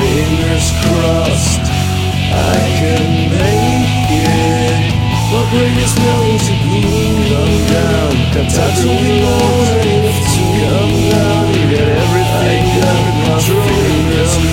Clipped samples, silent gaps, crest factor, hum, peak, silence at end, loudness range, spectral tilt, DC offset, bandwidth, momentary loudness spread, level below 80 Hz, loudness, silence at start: under 0.1%; none; 12 dB; none; 0 dBFS; 0 s; 1 LU; -5.5 dB/octave; under 0.1%; 16.5 kHz; 2 LU; -24 dBFS; -12 LUFS; 0 s